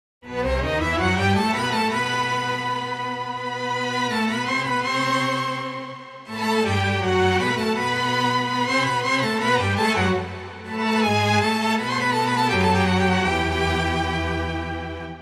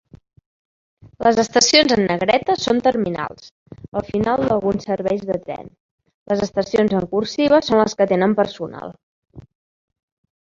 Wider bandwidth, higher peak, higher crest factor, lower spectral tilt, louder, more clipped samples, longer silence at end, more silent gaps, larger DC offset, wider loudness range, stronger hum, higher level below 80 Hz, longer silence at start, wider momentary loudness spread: first, 15 kHz vs 7.6 kHz; second, -8 dBFS vs 0 dBFS; second, 14 dB vs 20 dB; about the same, -5 dB/octave vs -4 dB/octave; second, -22 LUFS vs -18 LUFS; neither; second, 0 s vs 1.05 s; second, none vs 3.51-3.66 s, 3.88-3.92 s, 5.80-5.98 s, 6.14-6.26 s, 9.03-9.22 s; neither; about the same, 3 LU vs 5 LU; neither; first, -40 dBFS vs -50 dBFS; second, 0.25 s vs 1.05 s; second, 9 LU vs 14 LU